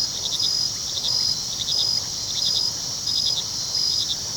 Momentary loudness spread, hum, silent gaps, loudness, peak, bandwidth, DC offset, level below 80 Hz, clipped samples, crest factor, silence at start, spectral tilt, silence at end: 3 LU; none; none; -21 LUFS; -10 dBFS; 19.5 kHz; under 0.1%; -52 dBFS; under 0.1%; 16 dB; 0 s; 0 dB/octave; 0 s